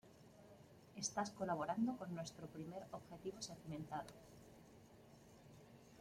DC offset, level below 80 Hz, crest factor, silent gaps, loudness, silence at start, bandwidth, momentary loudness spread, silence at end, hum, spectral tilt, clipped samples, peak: under 0.1%; -76 dBFS; 22 dB; none; -47 LUFS; 0.05 s; 16.5 kHz; 22 LU; 0 s; none; -4.5 dB/octave; under 0.1%; -28 dBFS